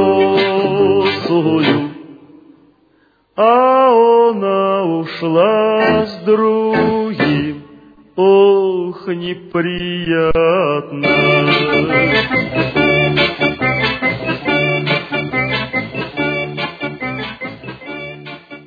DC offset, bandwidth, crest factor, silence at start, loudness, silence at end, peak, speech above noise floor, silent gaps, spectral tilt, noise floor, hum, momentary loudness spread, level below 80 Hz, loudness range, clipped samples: under 0.1%; 5 kHz; 14 dB; 0 s; -14 LUFS; 0.05 s; 0 dBFS; 41 dB; none; -7.5 dB/octave; -55 dBFS; none; 13 LU; -42 dBFS; 5 LU; under 0.1%